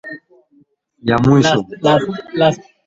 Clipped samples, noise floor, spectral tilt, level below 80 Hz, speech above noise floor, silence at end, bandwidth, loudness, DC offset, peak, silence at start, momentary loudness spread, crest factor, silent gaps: under 0.1%; -55 dBFS; -6 dB/octave; -46 dBFS; 41 dB; 0.3 s; 7.8 kHz; -15 LUFS; under 0.1%; -2 dBFS; 0.05 s; 14 LU; 14 dB; none